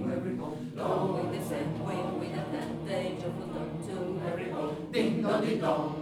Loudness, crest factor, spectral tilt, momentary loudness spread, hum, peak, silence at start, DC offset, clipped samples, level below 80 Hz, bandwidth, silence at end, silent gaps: -33 LUFS; 16 dB; -7 dB/octave; 8 LU; none; -16 dBFS; 0 s; under 0.1%; under 0.1%; -60 dBFS; 16 kHz; 0 s; none